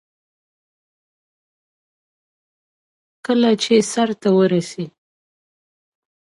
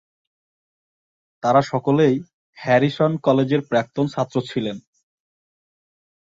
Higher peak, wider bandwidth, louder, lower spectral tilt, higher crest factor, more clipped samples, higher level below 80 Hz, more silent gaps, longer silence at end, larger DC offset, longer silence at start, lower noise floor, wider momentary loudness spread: about the same, -2 dBFS vs -4 dBFS; first, 11.5 kHz vs 7.6 kHz; first, -17 LUFS vs -20 LUFS; second, -5 dB/octave vs -7 dB/octave; about the same, 20 dB vs 18 dB; neither; second, -70 dBFS vs -62 dBFS; second, none vs 2.33-2.53 s; second, 1.3 s vs 1.5 s; neither; first, 3.3 s vs 1.45 s; about the same, under -90 dBFS vs under -90 dBFS; first, 16 LU vs 9 LU